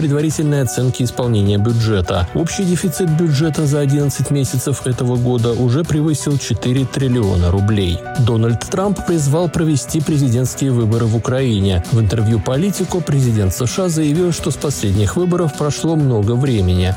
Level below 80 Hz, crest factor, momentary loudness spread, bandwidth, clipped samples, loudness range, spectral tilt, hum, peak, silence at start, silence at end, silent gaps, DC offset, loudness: -38 dBFS; 10 dB; 3 LU; 17 kHz; under 0.1%; 1 LU; -6 dB/octave; none; -6 dBFS; 0 s; 0 s; none; under 0.1%; -16 LUFS